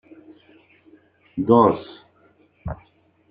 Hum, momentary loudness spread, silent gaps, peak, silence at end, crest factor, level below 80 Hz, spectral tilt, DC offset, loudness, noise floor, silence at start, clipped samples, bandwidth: none; 23 LU; none; -2 dBFS; 0.55 s; 22 dB; -50 dBFS; -11 dB/octave; under 0.1%; -18 LUFS; -58 dBFS; 1.35 s; under 0.1%; 4.9 kHz